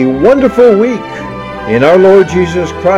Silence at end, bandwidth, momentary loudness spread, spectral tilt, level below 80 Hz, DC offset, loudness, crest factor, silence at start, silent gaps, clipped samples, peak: 0 s; 10 kHz; 16 LU; -7 dB/octave; -34 dBFS; under 0.1%; -8 LUFS; 8 dB; 0 s; none; 2%; 0 dBFS